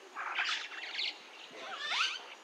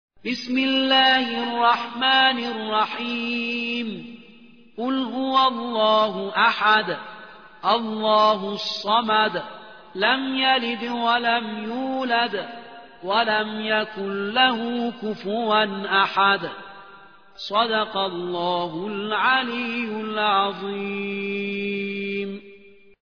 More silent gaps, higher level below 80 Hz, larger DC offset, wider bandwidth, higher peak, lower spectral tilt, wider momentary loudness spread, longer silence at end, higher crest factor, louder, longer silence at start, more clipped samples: neither; second, under -90 dBFS vs -70 dBFS; second, under 0.1% vs 0.2%; first, 15.5 kHz vs 5.4 kHz; second, -18 dBFS vs -4 dBFS; second, 2 dB/octave vs -5 dB/octave; about the same, 14 LU vs 12 LU; second, 0 s vs 0.6 s; about the same, 22 dB vs 20 dB; second, -35 LUFS vs -22 LUFS; second, 0 s vs 0.25 s; neither